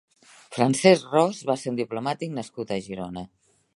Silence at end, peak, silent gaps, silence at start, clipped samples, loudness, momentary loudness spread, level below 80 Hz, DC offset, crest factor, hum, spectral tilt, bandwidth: 0.5 s; -2 dBFS; none; 0.5 s; under 0.1%; -24 LUFS; 17 LU; -64 dBFS; under 0.1%; 22 dB; none; -5 dB/octave; 11.5 kHz